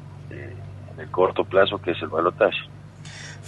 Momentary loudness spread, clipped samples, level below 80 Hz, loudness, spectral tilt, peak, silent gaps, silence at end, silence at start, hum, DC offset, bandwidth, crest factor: 19 LU; under 0.1%; -56 dBFS; -22 LUFS; -5.5 dB/octave; -4 dBFS; none; 0 s; 0 s; none; under 0.1%; 10.5 kHz; 20 dB